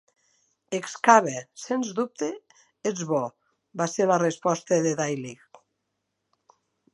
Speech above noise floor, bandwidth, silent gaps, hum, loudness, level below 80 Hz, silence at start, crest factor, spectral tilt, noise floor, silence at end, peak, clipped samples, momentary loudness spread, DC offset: 55 dB; 11.5 kHz; none; none; -25 LUFS; -78 dBFS; 0.7 s; 26 dB; -4.5 dB/octave; -79 dBFS; 1.6 s; -2 dBFS; under 0.1%; 16 LU; under 0.1%